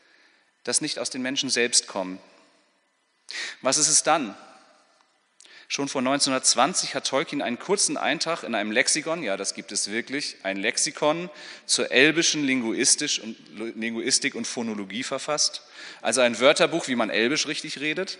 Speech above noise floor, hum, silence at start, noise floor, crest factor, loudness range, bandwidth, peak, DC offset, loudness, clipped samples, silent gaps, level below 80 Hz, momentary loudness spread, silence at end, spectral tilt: 44 dB; none; 0.65 s; -69 dBFS; 22 dB; 3 LU; 11 kHz; -2 dBFS; under 0.1%; -23 LUFS; under 0.1%; none; -80 dBFS; 13 LU; 0 s; -1.5 dB/octave